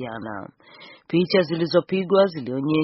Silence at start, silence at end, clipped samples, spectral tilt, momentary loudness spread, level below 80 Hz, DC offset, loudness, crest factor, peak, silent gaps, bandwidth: 0 s; 0 s; under 0.1%; -5 dB/octave; 15 LU; -64 dBFS; under 0.1%; -22 LUFS; 18 dB; -6 dBFS; none; 6 kHz